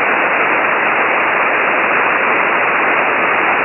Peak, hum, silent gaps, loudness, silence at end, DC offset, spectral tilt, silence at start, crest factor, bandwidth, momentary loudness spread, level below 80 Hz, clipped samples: -2 dBFS; none; none; -12 LUFS; 0 s; under 0.1%; -6.5 dB/octave; 0 s; 12 dB; 3.5 kHz; 0 LU; -56 dBFS; under 0.1%